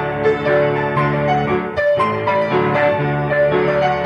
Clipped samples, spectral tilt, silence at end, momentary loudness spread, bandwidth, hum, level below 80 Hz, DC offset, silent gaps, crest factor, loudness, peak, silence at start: under 0.1%; -8 dB/octave; 0 s; 2 LU; 9.6 kHz; none; -44 dBFS; under 0.1%; none; 12 dB; -17 LUFS; -4 dBFS; 0 s